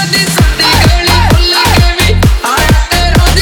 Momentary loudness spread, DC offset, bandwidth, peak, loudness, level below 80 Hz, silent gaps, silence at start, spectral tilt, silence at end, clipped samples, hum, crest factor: 2 LU; under 0.1%; over 20 kHz; 0 dBFS; -8 LUFS; -12 dBFS; none; 0 s; -4 dB/octave; 0 s; under 0.1%; none; 8 dB